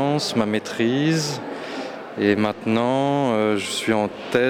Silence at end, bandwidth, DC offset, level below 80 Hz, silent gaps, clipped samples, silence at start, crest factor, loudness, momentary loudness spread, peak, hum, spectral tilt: 0 s; 17 kHz; under 0.1%; -62 dBFS; none; under 0.1%; 0 s; 16 dB; -22 LUFS; 10 LU; -6 dBFS; none; -5 dB/octave